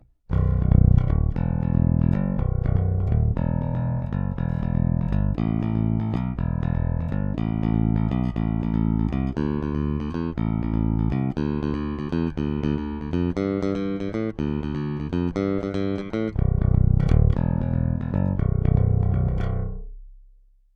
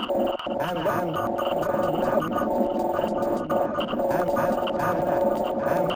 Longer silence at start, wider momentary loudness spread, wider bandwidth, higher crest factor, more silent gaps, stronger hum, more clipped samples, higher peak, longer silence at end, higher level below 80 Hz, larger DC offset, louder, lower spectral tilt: first, 0.3 s vs 0 s; first, 7 LU vs 3 LU; second, 6.4 kHz vs 17 kHz; about the same, 18 dB vs 14 dB; neither; neither; neither; first, -4 dBFS vs -10 dBFS; first, 0.6 s vs 0 s; first, -28 dBFS vs -50 dBFS; neither; about the same, -24 LUFS vs -25 LUFS; first, -10.5 dB/octave vs -6 dB/octave